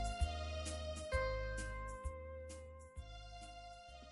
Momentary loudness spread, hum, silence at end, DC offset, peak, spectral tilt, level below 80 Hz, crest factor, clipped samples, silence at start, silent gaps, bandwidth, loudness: 14 LU; none; 0 s; under 0.1%; -26 dBFS; -4.5 dB/octave; -48 dBFS; 18 dB; under 0.1%; 0 s; none; 11.5 kHz; -46 LUFS